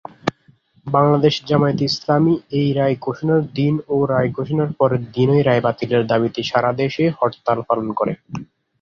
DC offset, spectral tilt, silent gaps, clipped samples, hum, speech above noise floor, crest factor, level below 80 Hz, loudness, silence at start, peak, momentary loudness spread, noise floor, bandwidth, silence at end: under 0.1%; -7.5 dB/octave; none; under 0.1%; none; 37 dB; 18 dB; -54 dBFS; -18 LUFS; 0.25 s; 0 dBFS; 7 LU; -55 dBFS; 7.4 kHz; 0.4 s